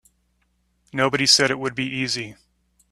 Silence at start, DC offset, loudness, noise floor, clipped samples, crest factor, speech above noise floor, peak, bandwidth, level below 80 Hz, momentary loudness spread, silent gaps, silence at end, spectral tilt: 0.95 s; under 0.1%; -20 LUFS; -67 dBFS; under 0.1%; 22 dB; 46 dB; -2 dBFS; 13.5 kHz; -60 dBFS; 14 LU; none; 0.6 s; -2.5 dB/octave